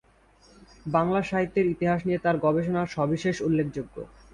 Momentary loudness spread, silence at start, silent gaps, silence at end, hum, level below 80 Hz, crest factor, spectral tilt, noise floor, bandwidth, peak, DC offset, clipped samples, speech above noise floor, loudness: 10 LU; 0.85 s; none; 0.25 s; none; -54 dBFS; 18 dB; -7.5 dB/octave; -58 dBFS; 10.5 kHz; -8 dBFS; under 0.1%; under 0.1%; 33 dB; -26 LUFS